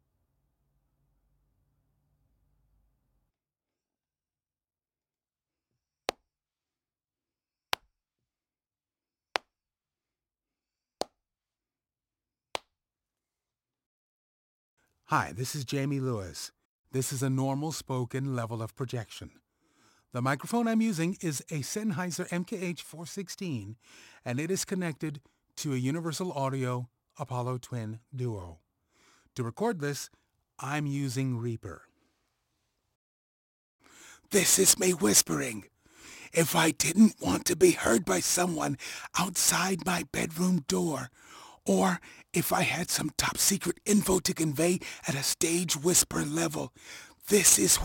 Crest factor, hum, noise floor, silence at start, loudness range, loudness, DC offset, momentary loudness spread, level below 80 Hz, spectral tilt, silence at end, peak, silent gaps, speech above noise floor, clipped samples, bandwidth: 28 dB; none; under -90 dBFS; 6.1 s; 20 LU; -28 LUFS; under 0.1%; 17 LU; -60 dBFS; -3.5 dB/octave; 0 s; -4 dBFS; 13.86-14.77 s, 16.65-16.84 s, 32.95-33.79 s; over 61 dB; under 0.1%; 17 kHz